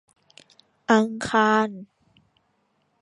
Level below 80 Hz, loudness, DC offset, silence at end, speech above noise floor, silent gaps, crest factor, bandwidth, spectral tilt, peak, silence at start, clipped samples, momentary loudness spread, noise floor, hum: -64 dBFS; -21 LUFS; under 0.1%; 1.2 s; 48 dB; none; 22 dB; 11 kHz; -5 dB/octave; -4 dBFS; 0.9 s; under 0.1%; 16 LU; -69 dBFS; none